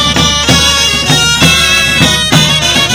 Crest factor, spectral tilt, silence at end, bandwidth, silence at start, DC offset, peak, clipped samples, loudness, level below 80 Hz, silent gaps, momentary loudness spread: 8 dB; -2.5 dB/octave; 0 s; over 20 kHz; 0 s; under 0.1%; 0 dBFS; 2%; -6 LUFS; -24 dBFS; none; 2 LU